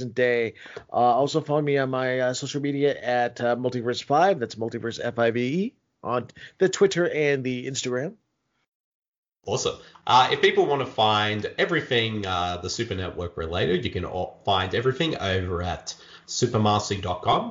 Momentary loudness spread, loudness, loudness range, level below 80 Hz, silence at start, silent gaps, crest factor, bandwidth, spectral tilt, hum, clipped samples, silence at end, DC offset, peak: 10 LU; -24 LUFS; 4 LU; -54 dBFS; 0 s; 8.68-9.02 s, 9.08-9.23 s; 18 dB; 7.8 kHz; -4.5 dB/octave; none; under 0.1%; 0 s; under 0.1%; -6 dBFS